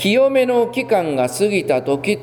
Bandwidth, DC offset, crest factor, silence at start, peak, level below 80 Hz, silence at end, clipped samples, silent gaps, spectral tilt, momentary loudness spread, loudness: 19 kHz; under 0.1%; 12 dB; 0 s; -4 dBFS; -58 dBFS; 0 s; under 0.1%; none; -5 dB/octave; 5 LU; -17 LUFS